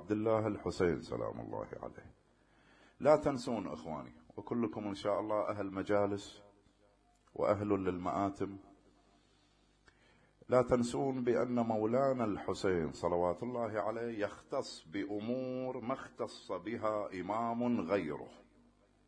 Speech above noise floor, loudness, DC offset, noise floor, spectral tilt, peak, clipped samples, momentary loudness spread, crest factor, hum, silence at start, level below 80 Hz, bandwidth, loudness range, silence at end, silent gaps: 35 dB; -36 LUFS; under 0.1%; -70 dBFS; -6.5 dB/octave; -14 dBFS; under 0.1%; 12 LU; 22 dB; 50 Hz at -70 dBFS; 0 s; -64 dBFS; 10.5 kHz; 5 LU; 0.65 s; none